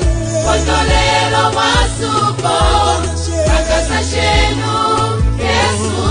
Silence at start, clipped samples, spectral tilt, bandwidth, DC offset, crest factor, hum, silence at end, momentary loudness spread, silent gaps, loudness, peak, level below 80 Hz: 0 s; under 0.1%; -4 dB/octave; 10 kHz; under 0.1%; 12 dB; none; 0 s; 4 LU; none; -13 LUFS; 0 dBFS; -20 dBFS